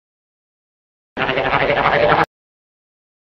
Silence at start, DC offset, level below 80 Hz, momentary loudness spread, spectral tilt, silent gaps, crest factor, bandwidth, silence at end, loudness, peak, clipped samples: 1.15 s; under 0.1%; -44 dBFS; 9 LU; -6.5 dB/octave; none; 20 dB; 7.4 kHz; 1.15 s; -16 LUFS; 0 dBFS; under 0.1%